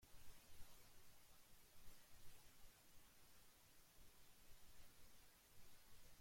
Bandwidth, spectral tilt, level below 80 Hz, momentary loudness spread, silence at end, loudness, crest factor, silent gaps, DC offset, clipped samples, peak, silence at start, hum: 16.5 kHz; -2.5 dB/octave; -72 dBFS; 2 LU; 0 s; -69 LUFS; 16 dB; none; under 0.1%; under 0.1%; -44 dBFS; 0 s; none